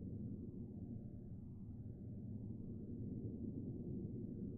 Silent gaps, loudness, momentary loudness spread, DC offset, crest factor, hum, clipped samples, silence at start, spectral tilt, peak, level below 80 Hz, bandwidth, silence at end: none; -50 LUFS; 5 LU; under 0.1%; 12 dB; none; under 0.1%; 0 s; -16 dB/octave; -36 dBFS; -60 dBFS; 1.6 kHz; 0 s